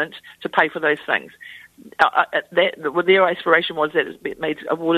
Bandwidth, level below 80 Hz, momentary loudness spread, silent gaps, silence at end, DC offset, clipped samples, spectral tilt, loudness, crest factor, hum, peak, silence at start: 13.5 kHz; -64 dBFS; 14 LU; none; 0 s; under 0.1%; under 0.1%; -5.5 dB/octave; -19 LUFS; 20 dB; none; 0 dBFS; 0 s